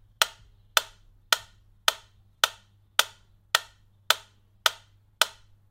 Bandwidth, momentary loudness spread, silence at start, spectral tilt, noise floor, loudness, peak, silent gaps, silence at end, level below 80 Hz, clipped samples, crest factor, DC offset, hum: 16.5 kHz; 1 LU; 0.2 s; 2 dB/octave; -54 dBFS; -27 LUFS; 0 dBFS; none; 0.45 s; -62 dBFS; under 0.1%; 30 dB; under 0.1%; none